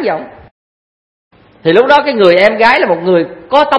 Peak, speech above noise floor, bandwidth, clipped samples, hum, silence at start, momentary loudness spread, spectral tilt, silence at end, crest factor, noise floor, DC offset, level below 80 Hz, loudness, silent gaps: 0 dBFS; over 81 dB; 11 kHz; 0.5%; none; 0 s; 9 LU; -6 dB/octave; 0 s; 12 dB; under -90 dBFS; under 0.1%; -50 dBFS; -9 LUFS; 0.51-1.31 s